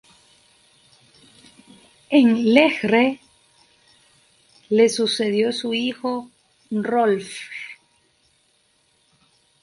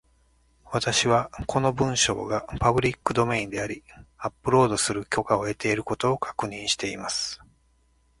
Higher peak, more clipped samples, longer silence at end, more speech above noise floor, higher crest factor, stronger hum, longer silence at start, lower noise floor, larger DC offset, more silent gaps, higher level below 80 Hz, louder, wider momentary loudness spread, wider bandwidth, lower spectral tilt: first, 0 dBFS vs -4 dBFS; neither; first, 1.9 s vs 0.85 s; first, 44 dB vs 39 dB; about the same, 22 dB vs 22 dB; neither; first, 2.1 s vs 0.65 s; about the same, -63 dBFS vs -64 dBFS; neither; neither; second, -68 dBFS vs -48 dBFS; first, -20 LUFS vs -25 LUFS; first, 17 LU vs 10 LU; about the same, 11.5 kHz vs 11.5 kHz; about the same, -4.5 dB/octave vs -4 dB/octave